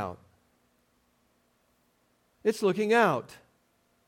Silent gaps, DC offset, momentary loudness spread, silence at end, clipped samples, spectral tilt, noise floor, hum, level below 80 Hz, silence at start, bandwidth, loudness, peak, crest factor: none; under 0.1%; 23 LU; 0.75 s; under 0.1%; -5.5 dB/octave; -70 dBFS; none; -76 dBFS; 0 s; 17 kHz; -27 LUFS; -12 dBFS; 20 dB